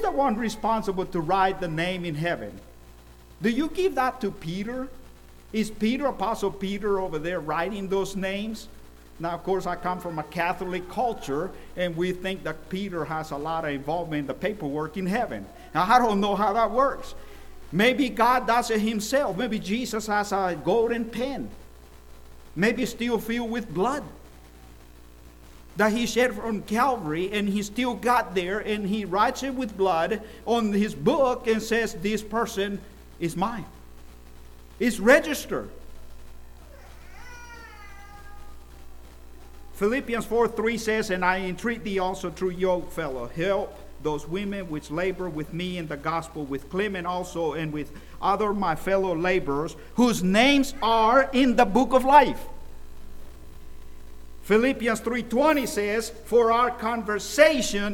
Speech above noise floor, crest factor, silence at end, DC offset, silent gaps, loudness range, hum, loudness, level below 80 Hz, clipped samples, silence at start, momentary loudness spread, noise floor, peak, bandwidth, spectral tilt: 24 dB; 22 dB; 0 s; under 0.1%; none; 8 LU; 60 Hz at -50 dBFS; -25 LUFS; -46 dBFS; under 0.1%; 0 s; 13 LU; -48 dBFS; -4 dBFS; 19 kHz; -5 dB/octave